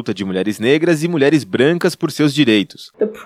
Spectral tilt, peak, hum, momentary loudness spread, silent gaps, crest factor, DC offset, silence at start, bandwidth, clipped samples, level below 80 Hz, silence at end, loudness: -5.5 dB/octave; -2 dBFS; none; 8 LU; none; 14 dB; under 0.1%; 0 s; 15.5 kHz; under 0.1%; -64 dBFS; 0 s; -16 LUFS